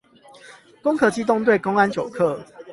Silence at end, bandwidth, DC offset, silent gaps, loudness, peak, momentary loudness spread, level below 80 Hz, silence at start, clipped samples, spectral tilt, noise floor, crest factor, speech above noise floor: 0 s; 11.5 kHz; under 0.1%; none; -20 LUFS; -4 dBFS; 6 LU; -60 dBFS; 0.45 s; under 0.1%; -6 dB/octave; -48 dBFS; 18 dB; 28 dB